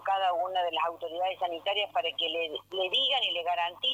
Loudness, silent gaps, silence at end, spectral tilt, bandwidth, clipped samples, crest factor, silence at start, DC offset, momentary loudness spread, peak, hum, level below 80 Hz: -29 LUFS; none; 0 s; -2 dB/octave; 15 kHz; under 0.1%; 14 dB; 0 s; under 0.1%; 7 LU; -16 dBFS; 50 Hz at -65 dBFS; -78 dBFS